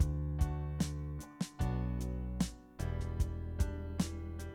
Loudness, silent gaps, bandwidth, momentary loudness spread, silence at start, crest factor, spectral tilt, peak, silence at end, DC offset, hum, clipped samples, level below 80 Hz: -39 LUFS; none; 16.5 kHz; 6 LU; 0 s; 18 dB; -6.5 dB/octave; -18 dBFS; 0 s; under 0.1%; none; under 0.1%; -40 dBFS